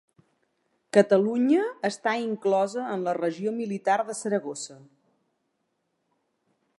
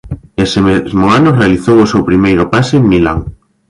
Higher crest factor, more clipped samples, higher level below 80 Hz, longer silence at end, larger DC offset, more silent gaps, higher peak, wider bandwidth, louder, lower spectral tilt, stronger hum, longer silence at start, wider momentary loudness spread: first, 22 dB vs 10 dB; neither; second, -82 dBFS vs -30 dBFS; first, 2.05 s vs 0.4 s; neither; neither; second, -6 dBFS vs 0 dBFS; about the same, 11.5 kHz vs 11.5 kHz; second, -26 LUFS vs -10 LUFS; second, -5 dB/octave vs -7 dB/octave; neither; first, 0.95 s vs 0.05 s; about the same, 8 LU vs 7 LU